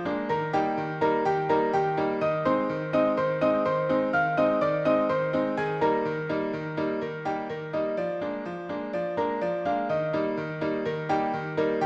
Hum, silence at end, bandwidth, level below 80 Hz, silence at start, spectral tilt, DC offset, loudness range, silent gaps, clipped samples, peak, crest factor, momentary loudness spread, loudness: none; 0 s; 8 kHz; -62 dBFS; 0 s; -7.5 dB/octave; under 0.1%; 5 LU; none; under 0.1%; -12 dBFS; 14 dB; 7 LU; -27 LUFS